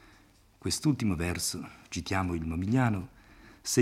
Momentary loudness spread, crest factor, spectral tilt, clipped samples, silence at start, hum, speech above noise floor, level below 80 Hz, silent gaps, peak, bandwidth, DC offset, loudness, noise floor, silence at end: 12 LU; 20 dB; -4.5 dB/octave; under 0.1%; 0.65 s; none; 30 dB; -54 dBFS; none; -12 dBFS; 16 kHz; under 0.1%; -31 LUFS; -60 dBFS; 0 s